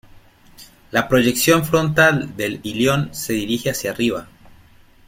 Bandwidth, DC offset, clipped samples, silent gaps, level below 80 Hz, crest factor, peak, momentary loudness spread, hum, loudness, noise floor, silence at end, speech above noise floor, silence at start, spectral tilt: 16.5 kHz; under 0.1%; under 0.1%; none; -48 dBFS; 18 dB; -2 dBFS; 9 LU; none; -18 LUFS; -49 dBFS; 0.8 s; 31 dB; 0.15 s; -4.5 dB/octave